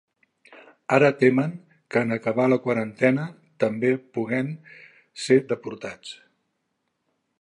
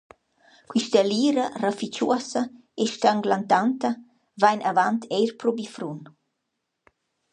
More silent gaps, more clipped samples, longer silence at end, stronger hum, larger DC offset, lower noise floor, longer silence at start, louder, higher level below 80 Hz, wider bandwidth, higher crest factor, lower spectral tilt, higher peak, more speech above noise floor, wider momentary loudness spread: neither; neither; about the same, 1.25 s vs 1.25 s; neither; neither; second, -76 dBFS vs -80 dBFS; second, 0.5 s vs 0.7 s; about the same, -23 LUFS vs -24 LUFS; about the same, -72 dBFS vs -74 dBFS; about the same, 11 kHz vs 10.5 kHz; about the same, 22 dB vs 20 dB; first, -6.5 dB/octave vs -4.5 dB/octave; about the same, -2 dBFS vs -4 dBFS; about the same, 53 dB vs 56 dB; first, 20 LU vs 11 LU